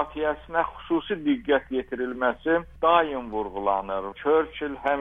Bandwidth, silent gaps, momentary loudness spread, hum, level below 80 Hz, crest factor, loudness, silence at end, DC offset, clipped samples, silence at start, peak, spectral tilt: 3.8 kHz; none; 9 LU; none; -50 dBFS; 20 dB; -26 LUFS; 0 s; under 0.1%; under 0.1%; 0 s; -6 dBFS; -7.5 dB/octave